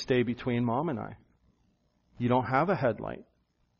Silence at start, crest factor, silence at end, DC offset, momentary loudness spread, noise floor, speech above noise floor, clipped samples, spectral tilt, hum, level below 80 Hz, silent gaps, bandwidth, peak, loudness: 0 s; 20 dB; 0.55 s; under 0.1%; 14 LU; -71 dBFS; 42 dB; under 0.1%; -6 dB/octave; none; -60 dBFS; none; 6.8 kHz; -12 dBFS; -29 LUFS